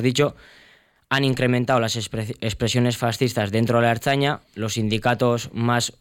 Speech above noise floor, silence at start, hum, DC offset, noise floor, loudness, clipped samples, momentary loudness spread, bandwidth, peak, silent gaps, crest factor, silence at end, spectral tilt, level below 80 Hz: 34 dB; 0 s; none; under 0.1%; -55 dBFS; -22 LUFS; under 0.1%; 7 LU; 17 kHz; -6 dBFS; none; 16 dB; 0.1 s; -5 dB/octave; -50 dBFS